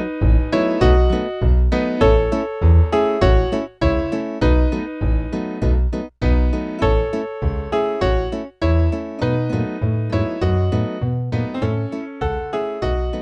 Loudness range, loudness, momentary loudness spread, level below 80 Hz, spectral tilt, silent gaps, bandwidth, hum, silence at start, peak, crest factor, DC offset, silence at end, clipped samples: 5 LU; -19 LUFS; 8 LU; -22 dBFS; -8.5 dB/octave; none; 7 kHz; none; 0 s; -2 dBFS; 16 dB; under 0.1%; 0 s; under 0.1%